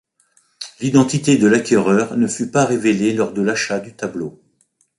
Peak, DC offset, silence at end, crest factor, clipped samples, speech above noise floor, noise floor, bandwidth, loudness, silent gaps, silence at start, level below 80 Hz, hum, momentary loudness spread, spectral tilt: -2 dBFS; under 0.1%; 0.7 s; 16 dB; under 0.1%; 46 dB; -62 dBFS; 11.5 kHz; -17 LUFS; none; 0.6 s; -58 dBFS; none; 13 LU; -5 dB/octave